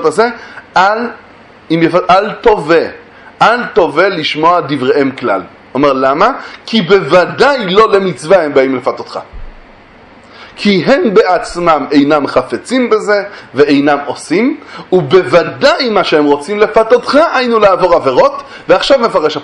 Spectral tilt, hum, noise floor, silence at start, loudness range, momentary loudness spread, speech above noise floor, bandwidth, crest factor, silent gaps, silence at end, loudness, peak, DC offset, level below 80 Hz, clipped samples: -5.5 dB/octave; none; -38 dBFS; 0 s; 3 LU; 7 LU; 28 dB; 11 kHz; 10 dB; none; 0 s; -10 LUFS; 0 dBFS; under 0.1%; -42 dBFS; 0.5%